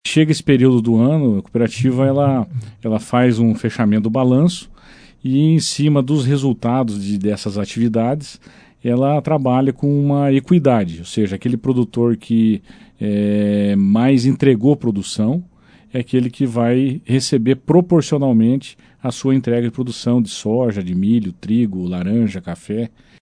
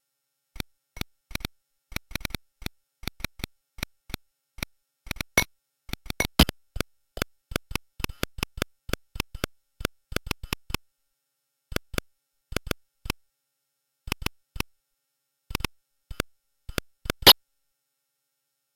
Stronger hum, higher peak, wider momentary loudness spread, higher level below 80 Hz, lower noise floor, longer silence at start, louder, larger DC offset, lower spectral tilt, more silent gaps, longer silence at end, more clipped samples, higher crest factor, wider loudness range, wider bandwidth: neither; about the same, 0 dBFS vs -2 dBFS; second, 9 LU vs 17 LU; second, -52 dBFS vs -40 dBFS; second, -44 dBFS vs -80 dBFS; second, 0.05 s vs 0.6 s; first, -17 LUFS vs -28 LUFS; neither; first, -7 dB/octave vs -3 dB/octave; neither; second, 0.35 s vs 1.45 s; neither; second, 16 dB vs 30 dB; second, 3 LU vs 14 LU; second, 10.5 kHz vs 17 kHz